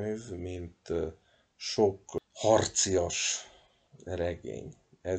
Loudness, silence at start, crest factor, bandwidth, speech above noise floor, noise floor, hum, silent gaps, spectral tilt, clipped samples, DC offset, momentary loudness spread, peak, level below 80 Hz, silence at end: -31 LUFS; 0 s; 22 dB; 9.4 kHz; 29 dB; -60 dBFS; none; none; -3.5 dB/octave; under 0.1%; under 0.1%; 16 LU; -10 dBFS; -56 dBFS; 0 s